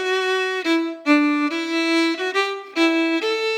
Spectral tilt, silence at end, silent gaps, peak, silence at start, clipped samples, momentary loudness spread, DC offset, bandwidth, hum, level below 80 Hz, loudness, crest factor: -1 dB/octave; 0 s; none; -4 dBFS; 0 s; under 0.1%; 4 LU; under 0.1%; 12.5 kHz; none; under -90 dBFS; -20 LUFS; 16 dB